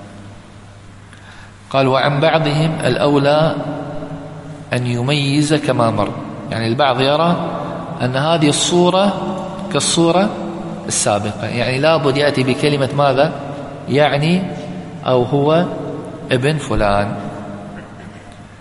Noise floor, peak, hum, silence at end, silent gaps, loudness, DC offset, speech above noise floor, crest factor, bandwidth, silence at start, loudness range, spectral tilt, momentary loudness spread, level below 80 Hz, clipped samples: -38 dBFS; 0 dBFS; none; 0 s; none; -16 LUFS; under 0.1%; 23 dB; 16 dB; 11.5 kHz; 0 s; 2 LU; -5 dB/octave; 15 LU; -42 dBFS; under 0.1%